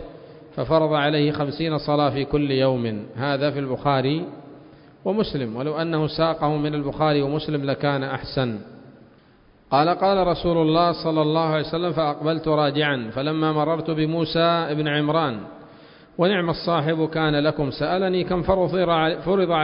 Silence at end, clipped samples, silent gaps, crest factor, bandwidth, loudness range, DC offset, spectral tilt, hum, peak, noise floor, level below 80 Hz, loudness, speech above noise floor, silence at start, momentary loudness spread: 0 s; under 0.1%; none; 18 dB; 5.4 kHz; 3 LU; under 0.1%; -11 dB/octave; none; -4 dBFS; -54 dBFS; -48 dBFS; -22 LUFS; 32 dB; 0 s; 7 LU